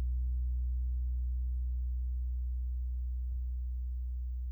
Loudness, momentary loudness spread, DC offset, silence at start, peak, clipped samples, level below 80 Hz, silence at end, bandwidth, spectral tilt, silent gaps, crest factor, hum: -38 LUFS; 4 LU; under 0.1%; 0 s; -28 dBFS; under 0.1%; -34 dBFS; 0 s; 0.3 kHz; -10 dB/octave; none; 6 dB; none